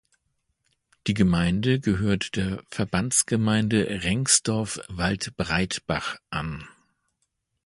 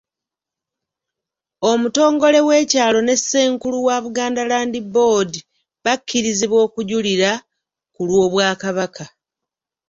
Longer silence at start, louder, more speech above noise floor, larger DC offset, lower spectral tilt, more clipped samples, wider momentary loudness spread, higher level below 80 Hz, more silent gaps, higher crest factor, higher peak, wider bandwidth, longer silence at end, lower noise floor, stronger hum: second, 1.05 s vs 1.6 s; second, -24 LUFS vs -17 LUFS; second, 52 dB vs 70 dB; neither; about the same, -4 dB/octave vs -3.5 dB/octave; neither; about the same, 11 LU vs 10 LU; first, -46 dBFS vs -60 dBFS; neither; first, 22 dB vs 16 dB; about the same, -4 dBFS vs -2 dBFS; first, 11.5 kHz vs 7.8 kHz; first, 0.95 s vs 0.8 s; second, -76 dBFS vs -86 dBFS; neither